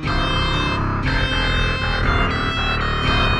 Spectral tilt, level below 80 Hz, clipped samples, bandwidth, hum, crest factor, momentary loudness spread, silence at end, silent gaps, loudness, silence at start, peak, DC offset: -5.5 dB/octave; -24 dBFS; under 0.1%; 10.5 kHz; none; 14 dB; 1 LU; 0 s; none; -20 LUFS; 0 s; -6 dBFS; under 0.1%